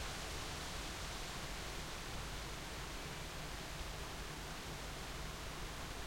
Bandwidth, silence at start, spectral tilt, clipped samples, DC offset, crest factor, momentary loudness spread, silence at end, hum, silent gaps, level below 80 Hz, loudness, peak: 16 kHz; 0 s; -3 dB/octave; under 0.1%; under 0.1%; 14 dB; 2 LU; 0 s; none; none; -52 dBFS; -46 LUFS; -32 dBFS